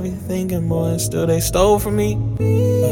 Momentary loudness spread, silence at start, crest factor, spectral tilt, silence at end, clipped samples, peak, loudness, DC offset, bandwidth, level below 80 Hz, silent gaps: 6 LU; 0 s; 16 dB; -6 dB/octave; 0 s; under 0.1%; -2 dBFS; -18 LUFS; under 0.1%; 17.5 kHz; -32 dBFS; none